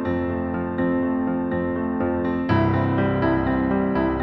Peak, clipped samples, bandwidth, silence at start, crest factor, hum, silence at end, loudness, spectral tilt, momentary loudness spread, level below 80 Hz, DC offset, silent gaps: -8 dBFS; under 0.1%; 5.4 kHz; 0 s; 14 dB; none; 0 s; -22 LUFS; -10.5 dB/octave; 4 LU; -40 dBFS; under 0.1%; none